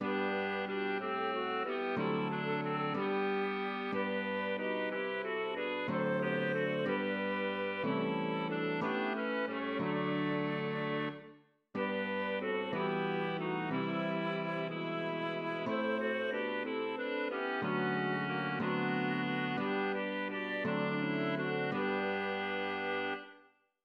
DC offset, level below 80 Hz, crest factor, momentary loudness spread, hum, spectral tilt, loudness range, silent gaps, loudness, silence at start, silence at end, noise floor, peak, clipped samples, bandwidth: under 0.1%; -84 dBFS; 14 dB; 3 LU; none; -8 dB/octave; 2 LU; none; -35 LUFS; 0 s; 0.45 s; -65 dBFS; -22 dBFS; under 0.1%; 6.2 kHz